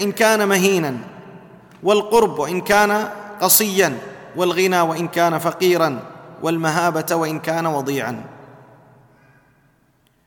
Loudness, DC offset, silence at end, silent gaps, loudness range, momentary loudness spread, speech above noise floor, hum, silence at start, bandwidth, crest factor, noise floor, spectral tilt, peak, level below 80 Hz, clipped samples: -18 LUFS; under 0.1%; 1.8 s; none; 6 LU; 14 LU; 42 dB; none; 0 s; 19 kHz; 20 dB; -60 dBFS; -3.5 dB/octave; 0 dBFS; -58 dBFS; under 0.1%